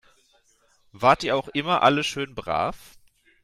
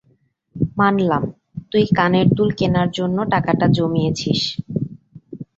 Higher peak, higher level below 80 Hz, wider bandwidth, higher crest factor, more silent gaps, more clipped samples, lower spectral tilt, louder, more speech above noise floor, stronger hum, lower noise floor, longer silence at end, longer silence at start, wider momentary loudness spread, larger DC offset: about the same, -4 dBFS vs -2 dBFS; second, -54 dBFS vs -48 dBFS; first, 15 kHz vs 7.8 kHz; about the same, 20 dB vs 16 dB; neither; neither; second, -4.5 dB/octave vs -6.5 dB/octave; second, -23 LUFS vs -18 LUFS; second, 40 dB vs 44 dB; neither; about the same, -63 dBFS vs -61 dBFS; first, 0.65 s vs 0.15 s; first, 0.95 s vs 0.55 s; about the same, 9 LU vs 11 LU; neither